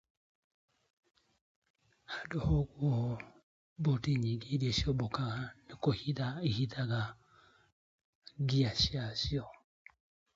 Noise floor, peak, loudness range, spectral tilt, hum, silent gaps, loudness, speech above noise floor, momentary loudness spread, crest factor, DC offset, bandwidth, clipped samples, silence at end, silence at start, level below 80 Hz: -65 dBFS; -18 dBFS; 4 LU; -6 dB/octave; none; 3.43-3.76 s, 7.72-8.22 s; -35 LUFS; 32 dB; 12 LU; 18 dB; under 0.1%; 7.8 kHz; under 0.1%; 0.85 s; 2.1 s; -52 dBFS